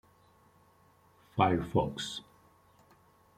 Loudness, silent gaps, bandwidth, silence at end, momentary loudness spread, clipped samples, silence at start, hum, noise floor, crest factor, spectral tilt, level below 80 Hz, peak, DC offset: -32 LUFS; none; 16 kHz; 1.15 s; 12 LU; under 0.1%; 1.35 s; none; -64 dBFS; 24 dB; -6 dB/octave; -60 dBFS; -12 dBFS; under 0.1%